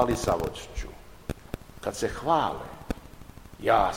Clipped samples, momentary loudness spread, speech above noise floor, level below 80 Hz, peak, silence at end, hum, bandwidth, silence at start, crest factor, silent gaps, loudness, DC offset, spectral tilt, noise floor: under 0.1%; 18 LU; 20 dB; -42 dBFS; -8 dBFS; 0 s; none; 16.5 kHz; 0 s; 22 dB; none; -30 LUFS; 0.2%; -5 dB/octave; -46 dBFS